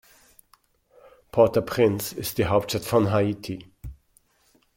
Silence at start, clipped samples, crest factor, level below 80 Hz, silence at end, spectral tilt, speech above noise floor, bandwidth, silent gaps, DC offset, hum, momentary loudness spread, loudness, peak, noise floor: 1.35 s; under 0.1%; 22 dB; -52 dBFS; 0.85 s; -5.5 dB/octave; 41 dB; 17 kHz; none; under 0.1%; none; 18 LU; -23 LUFS; -4 dBFS; -64 dBFS